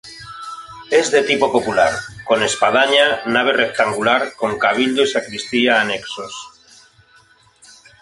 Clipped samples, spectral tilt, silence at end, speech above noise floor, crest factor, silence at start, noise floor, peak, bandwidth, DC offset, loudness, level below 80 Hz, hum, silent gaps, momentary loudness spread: under 0.1%; -2.5 dB/octave; 1.55 s; 35 dB; 18 dB; 0.05 s; -52 dBFS; -2 dBFS; 11.5 kHz; under 0.1%; -16 LUFS; -56 dBFS; none; none; 17 LU